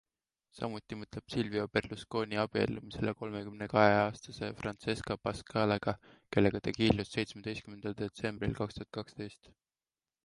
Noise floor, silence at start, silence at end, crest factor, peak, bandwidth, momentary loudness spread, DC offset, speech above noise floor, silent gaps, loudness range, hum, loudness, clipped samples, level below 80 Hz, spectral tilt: under -90 dBFS; 0.55 s; 0.9 s; 26 dB; -10 dBFS; 11.5 kHz; 13 LU; under 0.1%; over 56 dB; none; 4 LU; none; -34 LUFS; under 0.1%; -58 dBFS; -6 dB/octave